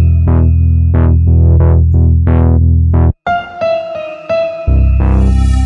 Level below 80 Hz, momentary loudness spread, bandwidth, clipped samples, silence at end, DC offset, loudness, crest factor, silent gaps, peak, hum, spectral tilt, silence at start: -14 dBFS; 7 LU; 4.3 kHz; under 0.1%; 0 s; under 0.1%; -11 LUFS; 8 dB; none; 0 dBFS; none; -9.5 dB/octave; 0 s